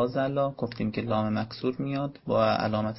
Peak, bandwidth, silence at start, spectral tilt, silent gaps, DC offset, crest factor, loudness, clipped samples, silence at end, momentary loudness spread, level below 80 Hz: -10 dBFS; 5.8 kHz; 0 s; -10.5 dB/octave; none; under 0.1%; 18 dB; -28 LUFS; under 0.1%; 0 s; 7 LU; -58 dBFS